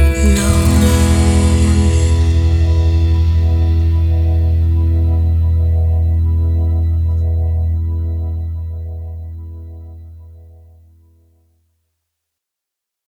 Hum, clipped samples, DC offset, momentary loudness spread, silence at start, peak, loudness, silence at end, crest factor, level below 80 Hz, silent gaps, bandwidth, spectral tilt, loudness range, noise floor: none; under 0.1%; under 0.1%; 15 LU; 0 s; 0 dBFS; -14 LUFS; 2.7 s; 12 dB; -18 dBFS; none; 14 kHz; -6.5 dB/octave; 15 LU; -82 dBFS